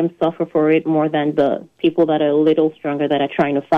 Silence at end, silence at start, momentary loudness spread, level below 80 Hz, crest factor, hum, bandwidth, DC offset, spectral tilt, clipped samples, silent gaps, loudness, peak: 0 s; 0 s; 5 LU; -62 dBFS; 12 dB; none; 4.8 kHz; under 0.1%; -8.5 dB/octave; under 0.1%; none; -17 LUFS; -6 dBFS